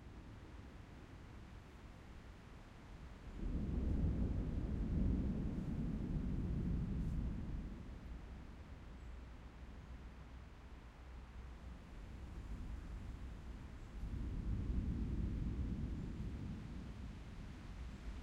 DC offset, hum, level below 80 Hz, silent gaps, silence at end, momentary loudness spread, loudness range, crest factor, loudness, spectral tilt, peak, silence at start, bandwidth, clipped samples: under 0.1%; none; -46 dBFS; none; 0 s; 16 LU; 14 LU; 18 dB; -46 LUFS; -8.5 dB/octave; -26 dBFS; 0 s; 8.8 kHz; under 0.1%